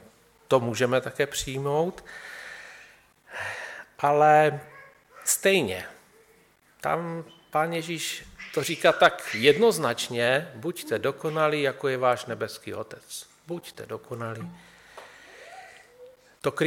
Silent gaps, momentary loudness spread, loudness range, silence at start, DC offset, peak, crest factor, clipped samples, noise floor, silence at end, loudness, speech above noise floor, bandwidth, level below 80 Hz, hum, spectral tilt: none; 21 LU; 13 LU; 0.5 s; under 0.1%; -4 dBFS; 22 dB; under 0.1%; -60 dBFS; 0 s; -25 LUFS; 35 dB; 17.5 kHz; -62 dBFS; none; -3.5 dB/octave